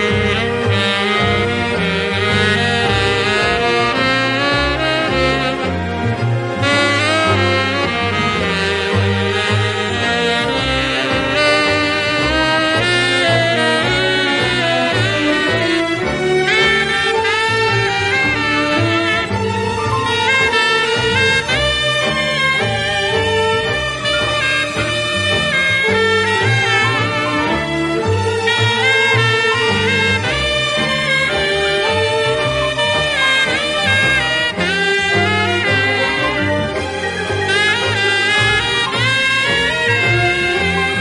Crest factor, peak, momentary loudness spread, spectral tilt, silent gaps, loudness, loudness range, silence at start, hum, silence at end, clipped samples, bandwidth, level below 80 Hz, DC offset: 14 dB; -2 dBFS; 4 LU; -4 dB/octave; none; -14 LUFS; 2 LU; 0 s; none; 0 s; under 0.1%; 11.5 kHz; -38 dBFS; under 0.1%